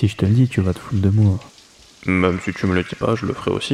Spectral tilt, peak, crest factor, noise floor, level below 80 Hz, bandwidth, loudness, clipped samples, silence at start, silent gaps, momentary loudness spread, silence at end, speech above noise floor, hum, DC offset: -7.5 dB/octave; -4 dBFS; 14 dB; -46 dBFS; -44 dBFS; 11 kHz; -19 LUFS; under 0.1%; 0 s; none; 6 LU; 0 s; 28 dB; none; under 0.1%